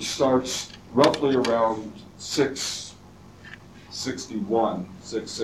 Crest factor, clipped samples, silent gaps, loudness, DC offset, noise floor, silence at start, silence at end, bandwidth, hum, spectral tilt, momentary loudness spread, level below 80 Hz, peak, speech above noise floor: 20 dB; under 0.1%; none; -25 LUFS; under 0.1%; -48 dBFS; 0 s; 0 s; 15 kHz; none; -4 dB/octave; 20 LU; -58 dBFS; -4 dBFS; 23 dB